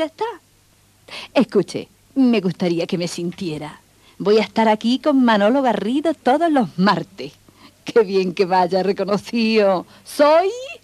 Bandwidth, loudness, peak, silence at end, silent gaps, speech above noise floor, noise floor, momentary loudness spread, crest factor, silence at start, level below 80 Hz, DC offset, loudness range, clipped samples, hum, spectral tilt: 13.5 kHz; -18 LUFS; -2 dBFS; 0.05 s; none; 37 dB; -55 dBFS; 14 LU; 16 dB; 0 s; -62 dBFS; under 0.1%; 4 LU; under 0.1%; none; -6 dB/octave